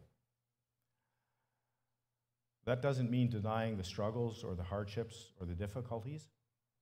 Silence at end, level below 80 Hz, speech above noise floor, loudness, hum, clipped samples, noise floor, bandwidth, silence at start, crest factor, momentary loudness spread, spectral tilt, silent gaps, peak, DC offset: 0.55 s; -64 dBFS; 51 dB; -40 LUFS; none; under 0.1%; -90 dBFS; 13 kHz; 0 s; 22 dB; 12 LU; -7 dB/octave; none; -20 dBFS; under 0.1%